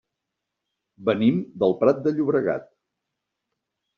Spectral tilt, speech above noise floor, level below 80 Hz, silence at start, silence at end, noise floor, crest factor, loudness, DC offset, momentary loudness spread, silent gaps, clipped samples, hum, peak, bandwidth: -6.5 dB/octave; 61 dB; -66 dBFS; 1 s; 1.35 s; -83 dBFS; 20 dB; -23 LUFS; under 0.1%; 7 LU; none; under 0.1%; none; -6 dBFS; 6.6 kHz